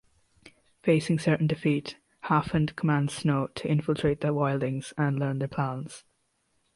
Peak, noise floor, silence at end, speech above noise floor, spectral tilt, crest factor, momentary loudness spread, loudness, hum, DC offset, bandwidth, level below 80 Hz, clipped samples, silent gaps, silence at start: -10 dBFS; -73 dBFS; 0.75 s; 46 dB; -7 dB/octave; 18 dB; 7 LU; -27 LUFS; none; under 0.1%; 11.5 kHz; -56 dBFS; under 0.1%; none; 0.45 s